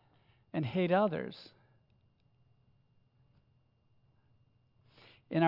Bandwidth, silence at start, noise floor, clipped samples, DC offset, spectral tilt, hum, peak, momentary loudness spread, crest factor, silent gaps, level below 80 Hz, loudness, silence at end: 5.8 kHz; 0.55 s; -71 dBFS; under 0.1%; under 0.1%; -6 dB/octave; none; -14 dBFS; 15 LU; 24 dB; none; -78 dBFS; -33 LUFS; 0 s